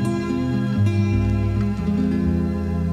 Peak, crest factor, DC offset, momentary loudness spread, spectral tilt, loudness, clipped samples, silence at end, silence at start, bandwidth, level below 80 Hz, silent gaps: -8 dBFS; 12 dB; under 0.1%; 3 LU; -8.5 dB/octave; -21 LUFS; under 0.1%; 0 s; 0 s; 9.8 kHz; -34 dBFS; none